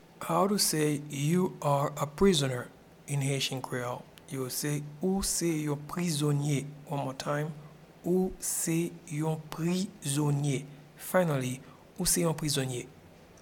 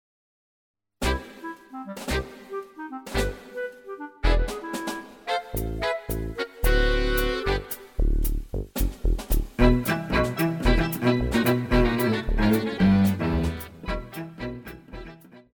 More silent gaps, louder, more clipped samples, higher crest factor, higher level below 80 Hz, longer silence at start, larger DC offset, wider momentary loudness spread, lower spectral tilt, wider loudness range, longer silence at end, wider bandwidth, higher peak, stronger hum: neither; second, -30 LUFS vs -26 LUFS; neither; about the same, 20 dB vs 20 dB; second, -54 dBFS vs -30 dBFS; second, 0.2 s vs 1 s; neither; second, 12 LU vs 16 LU; second, -4.5 dB/octave vs -6 dB/octave; second, 3 LU vs 9 LU; about the same, 0.1 s vs 0.15 s; about the same, 18.5 kHz vs over 20 kHz; second, -12 dBFS vs -6 dBFS; neither